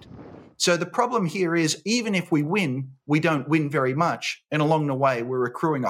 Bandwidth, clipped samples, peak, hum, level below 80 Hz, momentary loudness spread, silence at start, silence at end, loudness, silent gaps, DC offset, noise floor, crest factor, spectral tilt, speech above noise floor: 16 kHz; under 0.1%; -6 dBFS; none; -70 dBFS; 4 LU; 0.05 s; 0 s; -24 LUFS; none; under 0.1%; -44 dBFS; 18 dB; -5 dB/octave; 21 dB